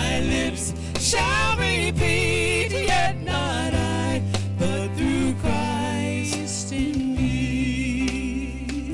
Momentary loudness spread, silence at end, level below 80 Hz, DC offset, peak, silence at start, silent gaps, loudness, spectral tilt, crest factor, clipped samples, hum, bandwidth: 6 LU; 0 s; -36 dBFS; under 0.1%; -8 dBFS; 0 s; none; -23 LUFS; -4.5 dB/octave; 14 dB; under 0.1%; none; 11.5 kHz